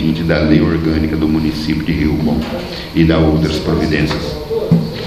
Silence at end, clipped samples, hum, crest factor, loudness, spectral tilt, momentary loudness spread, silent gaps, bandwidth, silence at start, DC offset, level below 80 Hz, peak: 0 s; under 0.1%; none; 14 dB; -15 LUFS; -7.5 dB/octave; 8 LU; none; 14 kHz; 0 s; under 0.1%; -28 dBFS; 0 dBFS